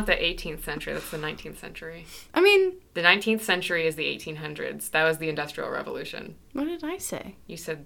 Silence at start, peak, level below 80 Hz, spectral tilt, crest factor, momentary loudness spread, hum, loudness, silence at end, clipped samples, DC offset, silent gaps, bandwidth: 0 s; -2 dBFS; -48 dBFS; -3.5 dB/octave; 26 dB; 19 LU; none; -26 LUFS; 0 s; under 0.1%; under 0.1%; none; 18.5 kHz